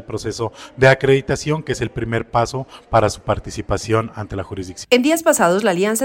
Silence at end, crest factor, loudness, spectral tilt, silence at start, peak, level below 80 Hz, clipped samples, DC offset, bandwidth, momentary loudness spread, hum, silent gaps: 0 s; 18 dB; -18 LUFS; -5 dB/octave; 0 s; -2 dBFS; -40 dBFS; under 0.1%; under 0.1%; 17 kHz; 13 LU; none; none